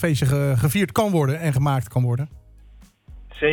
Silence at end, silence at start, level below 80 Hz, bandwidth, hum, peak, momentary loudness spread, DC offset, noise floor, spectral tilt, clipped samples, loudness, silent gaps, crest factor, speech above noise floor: 0 s; 0 s; -44 dBFS; 19 kHz; none; -8 dBFS; 4 LU; under 0.1%; -48 dBFS; -6.5 dB/octave; under 0.1%; -21 LUFS; none; 12 dB; 28 dB